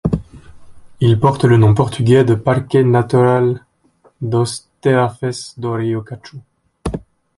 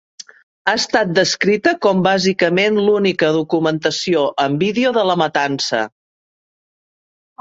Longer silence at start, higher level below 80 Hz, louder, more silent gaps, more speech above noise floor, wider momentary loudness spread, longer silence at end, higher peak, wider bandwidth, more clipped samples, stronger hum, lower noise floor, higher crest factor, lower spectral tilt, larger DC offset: second, 0.05 s vs 0.65 s; first, -40 dBFS vs -60 dBFS; about the same, -15 LUFS vs -16 LUFS; neither; second, 40 dB vs over 74 dB; first, 15 LU vs 4 LU; second, 0.4 s vs 1.55 s; about the same, 0 dBFS vs -2 dBFS; first, 11.5 kHz vs 8 kHz; neither; neither; second, -54 dBFS vs under -90 dBFS; about the same, 16 dB vs 16 dB; first, -7.5 dB/octave vs -4.5 dB/octave; neither